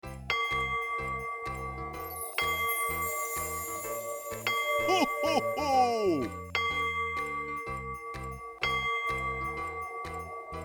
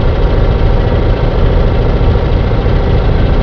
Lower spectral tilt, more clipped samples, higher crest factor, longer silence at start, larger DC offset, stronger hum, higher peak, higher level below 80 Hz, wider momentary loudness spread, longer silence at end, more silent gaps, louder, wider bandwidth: second, -3 dB/octave vs -9 dB/octave; neither; first, 20 dB vs 10 dB; about the same, 0.05 s vs 0 s; second, under 0.1% vs 1%; neither; second, -14 dBFS vs 0 dBFS; second, -52 dBFS vs -12 dBFS; first, 11 LU vs 1 LU; about the same, 0 s vs 0 s; neither; second, -31 LUFS vs -12 LUFS; first, over 20 kHz vs 5.4 kHz